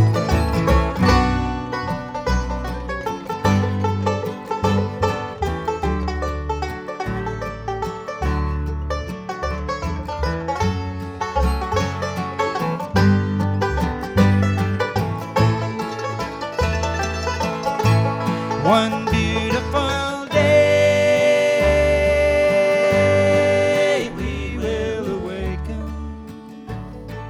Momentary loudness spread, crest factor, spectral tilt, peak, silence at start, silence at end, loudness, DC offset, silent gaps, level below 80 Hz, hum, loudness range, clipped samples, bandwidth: 11 LU; 16 dB; -6 dB/octave; -4 dBFS; 0 s; 0 s; -20 LUFS; under 0.1%; none; -30 dBFS; none; 9 LU; under 0.1%; 15 kHz